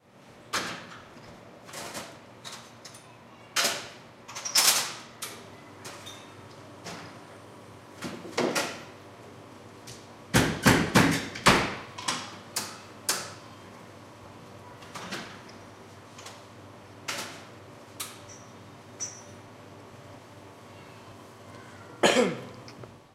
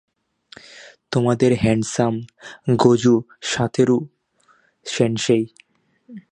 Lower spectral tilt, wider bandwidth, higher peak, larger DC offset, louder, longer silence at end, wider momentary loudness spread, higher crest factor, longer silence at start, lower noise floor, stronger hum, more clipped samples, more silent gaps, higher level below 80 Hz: second, -3 dB/octave vs -6 dB/octave; first, 16 kHz vs 10.5 kHz; about the same, -4 dBFS vs -2 dBFS; neither; second, -28 LUFS vs -19 LUFS; about the same, 0.15 s vs 0.15 s; first, 26 LU vs 15 LU; first, 28 dB vs 20 dB; second, 0.3 s vs 0.75 s; second, -53 dBFS vs -60 dBFS; neither; neither; neither; about the same, -54 dBFS vs -52 dBFS